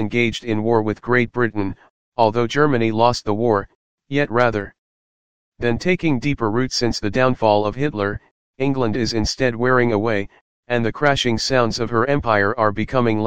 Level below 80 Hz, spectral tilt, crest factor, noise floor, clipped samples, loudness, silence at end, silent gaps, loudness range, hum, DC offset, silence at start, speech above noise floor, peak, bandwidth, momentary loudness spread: -42 dBFS; -5.5 dB/octave; 18 dB; under -90 dBFS; under 0.1%; -19 LUFS; 0 s; 1.90-2.12 s, 3.75-3.98 s, 4.78-5.52 s, 8.31-8.54 s, 10.41-10.63 s; 2 LU; none; 2%; 0 s; over 71 dB; 0 dBFS; 9.6 kHz; 8 LU